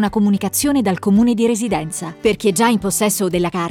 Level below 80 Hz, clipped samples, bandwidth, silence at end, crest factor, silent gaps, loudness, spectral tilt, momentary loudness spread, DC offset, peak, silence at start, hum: -44 dBFS; under 0.1%; 17.5 kHz; 0 s; 14 dB; none; -17 LUFS; -4.5 dB/octave; 5 LU; under 0.1%; -4 dBFS; 0 s; none